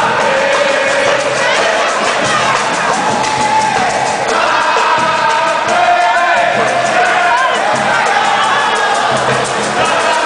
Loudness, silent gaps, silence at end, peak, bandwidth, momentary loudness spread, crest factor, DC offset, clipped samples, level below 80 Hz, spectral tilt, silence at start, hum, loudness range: -11 LUFS; none; 0 s; 0 dBFS; 10.5 kHz; 3 LU; 12 dB; under 0.1%; under 0.1%; -48 dBFS; -2 dB/octave; 0 s; none; 1 LU